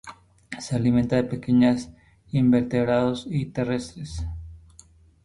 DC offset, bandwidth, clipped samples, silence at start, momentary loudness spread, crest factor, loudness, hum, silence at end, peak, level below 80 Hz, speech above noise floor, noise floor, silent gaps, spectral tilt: under 0.1%; 11 kHz; under 0.1%; 0.05 s; 19 LU; 16 dB; -24 LUFS; none; 0.65 s; -8 dBFS; -44 dBFS; 31 dB; -53 dBFS; none; -7 dB/octave